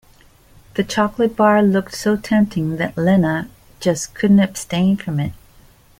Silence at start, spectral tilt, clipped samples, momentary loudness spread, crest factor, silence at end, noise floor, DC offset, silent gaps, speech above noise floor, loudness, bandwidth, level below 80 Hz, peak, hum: 0.75 s; -6 dB/octave; under 0.1%; 10 LU; 16 dB; 0.7 s; -49 dBFS; under 0.1%; none; 33 dB; -18 LUFS; 16 kHz; -48 dBFS; -2 dBFS; none